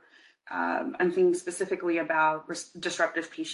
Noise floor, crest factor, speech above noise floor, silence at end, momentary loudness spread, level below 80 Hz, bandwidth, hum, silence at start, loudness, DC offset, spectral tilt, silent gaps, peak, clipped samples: -55 dBFS; 18 dB; 27 dB; 0 s; 9 LU; -76 dBFS; 11.5 kHz; none; 0.45 s; -28 LUFS; under 0.1%; -4 dB/octave; none; -12 dBFS; under 0.1%